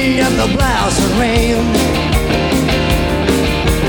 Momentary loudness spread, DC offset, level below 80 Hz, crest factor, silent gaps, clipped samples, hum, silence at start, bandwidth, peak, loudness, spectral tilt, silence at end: 1 LU; under 0.1%; -20 dBFS; 12 dB; none; under 0.1%; none; 0 s; over 20 kHz; 0 dBFS; -14 LUFS; -5 dB/octave; 0 s